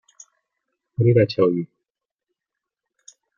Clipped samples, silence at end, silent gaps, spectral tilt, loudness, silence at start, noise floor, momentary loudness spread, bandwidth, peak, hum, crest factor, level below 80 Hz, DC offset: under 0.1%; 1.75 s; none; -8 dB/octave; -19 LUFS; 1 s; -85 dBFS; 18 LU; 7.2 kHz; -4 dBFS; none; 20 dB; -64 dBFS; under 0.1%